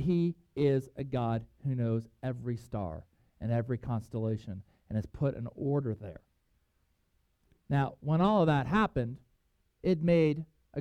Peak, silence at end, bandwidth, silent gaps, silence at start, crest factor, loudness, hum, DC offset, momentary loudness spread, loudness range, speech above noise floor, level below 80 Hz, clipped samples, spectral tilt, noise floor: -14 dBFS; 0 s; 9.6 kHz; none; 0 s; 18 dB; -32 LUFS; none; under 0.1%; 13 LU; 7 LU; 43 dB; -56 dBFS; under 0.1%; -9 dB/octave; -74 dBFS